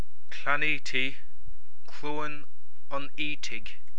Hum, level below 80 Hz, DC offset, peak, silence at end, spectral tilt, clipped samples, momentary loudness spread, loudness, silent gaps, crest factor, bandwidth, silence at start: none; -56 dBFS; 10%; -10 dBFS; 0.2 s; -4 dB/octave; under 0.1%; 18 LU; -32 LUFS; none; 24 dB; 11 kHz; 0.3 s